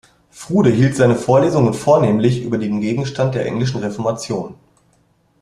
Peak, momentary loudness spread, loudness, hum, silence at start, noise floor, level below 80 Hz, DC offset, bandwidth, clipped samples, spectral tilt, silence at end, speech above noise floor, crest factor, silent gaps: -2 dBFS; 10 LU; -17 LUFS; none; 0.35 s; -58 dBFS; -50 dBFS; under 0.1%; 12 kHz; under 0.1%; -7 dB/octave; 0.9 s; 43 dB; 16 dB; none